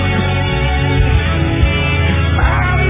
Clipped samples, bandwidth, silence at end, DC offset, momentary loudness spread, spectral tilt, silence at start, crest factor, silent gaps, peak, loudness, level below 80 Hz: under 0.1%; 3.8 kHz; 0 s; under 0.1%; 2 LU; -10.5 dB/octave; 0 s; 12 dB; none; 0 dBFS; -14 LUFS; -18 dBFS